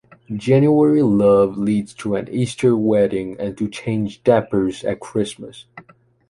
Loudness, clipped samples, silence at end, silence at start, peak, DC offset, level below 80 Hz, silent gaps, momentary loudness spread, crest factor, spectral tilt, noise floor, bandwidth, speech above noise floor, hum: -18 LUFS; under 0.1%; 0.5 s; 0.3 s; -2 dBFS; under 0.1%; -52 dBFS; none; 12 LU; 16 dB; -7.5 dB/octave; -50 dBFS; 11.5 kHz; 33 dB; none